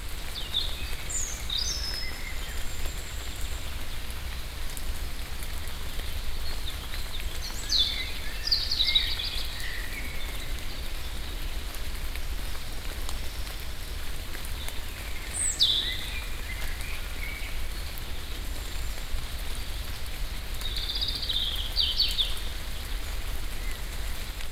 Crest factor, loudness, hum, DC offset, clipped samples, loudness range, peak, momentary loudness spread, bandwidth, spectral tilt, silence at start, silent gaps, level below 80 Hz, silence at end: 20 dB; -31 LUFS; none; under 0.1%; under 0.1%; 10 LU; -10 dBFS; 13 LU; 16.5 kHz; -1.5 dB/octave; 0 s; none; -34 dBFS; 0 s